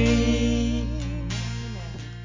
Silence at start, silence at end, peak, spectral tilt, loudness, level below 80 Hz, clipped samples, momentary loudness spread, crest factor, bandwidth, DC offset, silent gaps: 0 s; 0 s; -10 dBFS; -6 dB/octave; -26 LUFS; -30 dBFS; under 0.1%; 13 LU; 14 dB; 7.6 kHz; under 0.1%; none